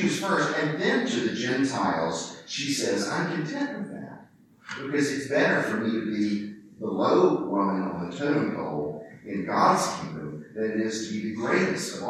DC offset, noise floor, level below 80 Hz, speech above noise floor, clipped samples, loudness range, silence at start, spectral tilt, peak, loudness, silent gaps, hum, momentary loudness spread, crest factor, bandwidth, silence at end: under 0.1%; -53 dBFS; -68 dBFS; 27 dB; under 0.1%; 3 LU; 0 s; -4.5 dB/octave; -8 dBFS; -26 LUFS; none; none; 13 LU; 18 dB; 14 kHz; 0 s